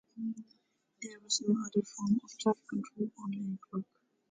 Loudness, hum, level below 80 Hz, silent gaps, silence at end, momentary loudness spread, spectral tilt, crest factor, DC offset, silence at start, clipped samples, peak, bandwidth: -35 LUFS; none; -80 dBFS; none; 0.5 s; 16 LU; -4.5 dB/octave; 18 dB; under 0.1%; 0.15 s; under 0.1%; -18 dBFS; 9.6 kHz